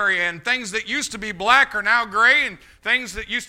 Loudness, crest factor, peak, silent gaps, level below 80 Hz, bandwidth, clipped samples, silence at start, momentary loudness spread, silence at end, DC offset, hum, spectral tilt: -19 LUFS; 20 dB; 0 dBFS; none; -50 dBFS; 16.5 kHz; under 0.1%; 0 s; 11 LU; 0 s; under 0.1%; none; -1.5 dB/octave